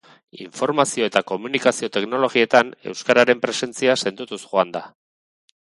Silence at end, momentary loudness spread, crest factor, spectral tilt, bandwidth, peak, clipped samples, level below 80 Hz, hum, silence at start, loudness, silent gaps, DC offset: 0.9 s; 11 LU; 20 dB; -3 dB/octave; 11.5 kHz; 0 dBFS; under 0.1%; -68 dBFS; none; 0.35 s; -20 LUFS; none; under 0.1%